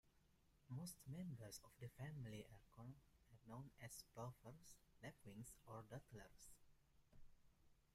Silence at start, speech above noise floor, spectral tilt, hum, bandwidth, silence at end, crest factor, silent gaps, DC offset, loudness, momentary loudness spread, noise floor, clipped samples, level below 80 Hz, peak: 0.05 s; 20 dB; -5 dB/octave; none; 16 kHz; 0 s; 18 dB; none; under 0.1%; -59 LUFS; 10 LU; -78 dBFS; under 0.1%; -76 dBFS; -42 dBFS